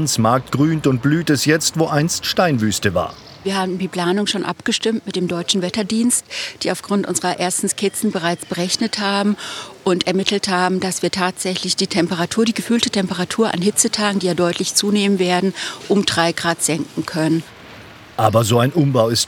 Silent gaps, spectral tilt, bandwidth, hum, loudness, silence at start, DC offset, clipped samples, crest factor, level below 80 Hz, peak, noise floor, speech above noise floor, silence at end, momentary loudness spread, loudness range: none; -4 dB/octave; 19.5 kHz; none; -18 LUFS; 0 s; under 0.1%; under 0.1%; 18 dB; -56 dBFS; 0 dBFS; -39 dBFS; 21 dB; 0 s; 7 LU; 2 LU